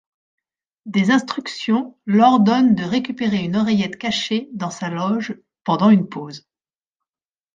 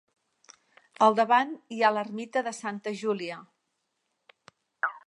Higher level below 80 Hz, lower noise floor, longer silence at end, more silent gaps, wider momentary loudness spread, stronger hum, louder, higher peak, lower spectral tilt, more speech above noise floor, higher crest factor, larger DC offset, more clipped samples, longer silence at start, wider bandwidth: first, -62 dBFS vs -86 dBFS; first, under -90 dBFS vs -79 dBFS; first, 1.2 s vs 0.1 s; neither; first, 14 LU vs 11 LU; neither; first, -19 LUFS vs -27 LUFS; first, -2 dBFS vs -8 dBFS; first, -6 dB/octave vs -4 dB/octave; first, over 72 dB vs 53 dB; second, 16 dB vs 22 dB; neither; neither; second, 0.85 s vs 1 s; second, 7.6 kHz vs 11.5 kHz